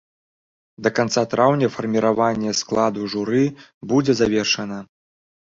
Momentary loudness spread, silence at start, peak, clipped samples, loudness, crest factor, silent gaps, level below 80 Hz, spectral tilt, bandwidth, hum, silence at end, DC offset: 7 LU; 0.8 s; -2 dBFS; under 0.1%; -20 LUFS; 18 dB; 3.74-3.81 s; -56 dBFS; -5 dB/octave; 7.6 kHz; none; 0.75 s; under 0.1%